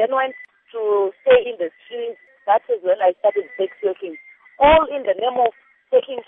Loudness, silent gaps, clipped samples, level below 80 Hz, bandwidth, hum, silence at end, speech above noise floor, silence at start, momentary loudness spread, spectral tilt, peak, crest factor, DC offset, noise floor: -19 LUFS; none; under 0.1%; -46 dBFS; 3.8 kHz; none; 0.05 s; 23 dB; 0 s; 16 LU; -8.5 dB/octave; -2 dBFS; 18 dB; under 0.1%; -41 dBFS